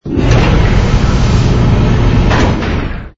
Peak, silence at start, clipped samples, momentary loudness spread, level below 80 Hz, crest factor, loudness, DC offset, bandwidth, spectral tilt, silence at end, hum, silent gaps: 0 dBFS; 0.05 s; under 0.1%; 4 LU; -14 dBFS; 10 dB; -11 LUFS; under 0.1%; 7.8 kHz; -7 dB/octave; 0.1 s; none; none